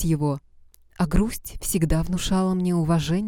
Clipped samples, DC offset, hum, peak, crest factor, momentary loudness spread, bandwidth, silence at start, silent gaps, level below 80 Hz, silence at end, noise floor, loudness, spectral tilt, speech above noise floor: under 0.1%; under 0.1%; none; -8 dBFS; 16 dB; 6 LU; 18 kHz; 0 s; none; -34 dBFS; 0 s; -52 dBFS; -24 LUFS; -6 dB/octave; 30 dB